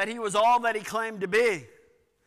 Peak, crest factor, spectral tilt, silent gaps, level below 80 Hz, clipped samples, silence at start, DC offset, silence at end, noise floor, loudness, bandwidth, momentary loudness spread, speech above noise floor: -16 dBFS; 12 dB; -3 dB/octave; none; -68 dBFS; under 0.1%; 0 s; under 0.1%; 0.6 s; -62 dBFS; -25 LUFS; 15.5 kHz; 9 LU; 37 dB